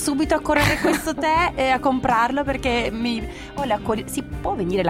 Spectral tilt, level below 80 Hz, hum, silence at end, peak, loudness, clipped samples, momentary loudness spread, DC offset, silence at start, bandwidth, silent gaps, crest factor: -4.5 dB/octave; -38 dBFS; none; 0 s; -2 dBFS; -21 LUFS; under 0.1%; 9 LU; under 0.1%; 0 s; 16.5 kHz; none; 18 dB